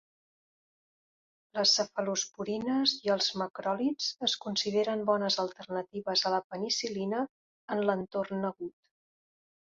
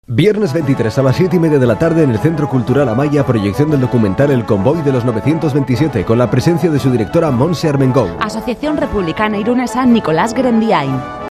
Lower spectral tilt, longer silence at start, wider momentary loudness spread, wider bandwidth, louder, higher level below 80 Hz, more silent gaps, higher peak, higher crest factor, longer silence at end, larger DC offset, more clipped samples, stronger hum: second, -3 dB/octave vs -7.5 dB/octave; first, 1.55 s vs 0.1 s; first, 9 LU vs 4 LU; second, 7.8 kHz vs 14 kHz; second, -31 LUFS vs -13 LUFS; second, -76 dBFS vs -38 dBFS; first, 3.50-3.54 s, 6.44-6.50 s, 7.29-7.68 s vs none; second, -12 dBFS vs 0 dBFS; first, 20 dB vs 12 dB; first, 1 s vs 0 s; neither; neither; neither